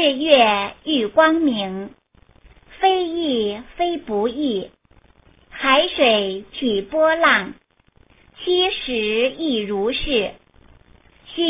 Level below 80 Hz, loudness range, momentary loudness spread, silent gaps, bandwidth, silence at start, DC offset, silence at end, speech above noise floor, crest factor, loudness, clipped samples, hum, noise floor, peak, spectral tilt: -48 dBFS; 4 LU; 13 LU; none; 3.9 kHz; 0 s; under 0.1%; 0 s; 37 dB; 20 dB; -19 LUFS; under 0.1%; none; -56 dBFS; 0 dBFS; -8 dB/octave